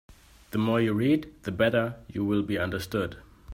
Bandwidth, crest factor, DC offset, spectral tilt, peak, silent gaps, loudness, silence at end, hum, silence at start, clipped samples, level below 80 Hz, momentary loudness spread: 16 kHz; 18 dB; under 0.1%; -7 dB/octave; -10 dBFS; none; -28 LUFS; 0 s; none; 0.1 s; under 0.1%; -54 dBFS; 9 LU